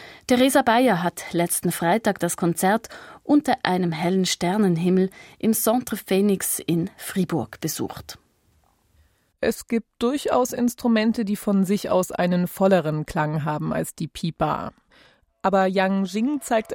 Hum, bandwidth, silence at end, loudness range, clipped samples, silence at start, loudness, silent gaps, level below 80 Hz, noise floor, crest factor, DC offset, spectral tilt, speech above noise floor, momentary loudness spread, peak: none; 16.5 kHz; 0 s; 5 LU; under 0.1%; 0 s; -22 LUFS; none; -54 dBFS; -63 dBFS; 22 dB; under 0.1%; -5 dB/octave; 41 dB; 8 LU; -2 dBFS